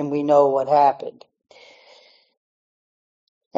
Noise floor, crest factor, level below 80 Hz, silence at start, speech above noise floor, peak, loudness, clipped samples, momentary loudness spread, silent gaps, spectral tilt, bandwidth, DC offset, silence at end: -53 dBFS; 18 dB; -76 dBFS; 0 s; 34 dB; -4 dBFS; -18 LUFS; under 0.1%; 16 LU; none; -5.5 dB/octave; 7.6 kHz; under 0.1%; 2.45 s